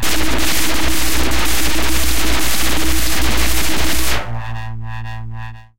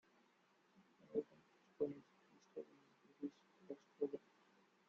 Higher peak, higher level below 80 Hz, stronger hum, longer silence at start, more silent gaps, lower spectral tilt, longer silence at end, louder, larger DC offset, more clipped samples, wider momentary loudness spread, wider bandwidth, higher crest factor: first, -2 dBFS vs -30 dBFS; first, -24 dBFS vs under -90 dBFS; neither; second, 0 s vs 0.8 s; neither; second, -2.5 dB/octave vs -7 dB/octave; second, 0 s vs 0.7 s; first, -18 LUFS vs -50 LUFS; first, 30% vs under 0.1%; neither; about the same, 11 LU vs 12 LU; first, 17 kHz vs 7.4 kHz; second, 10 dB vs 22 dB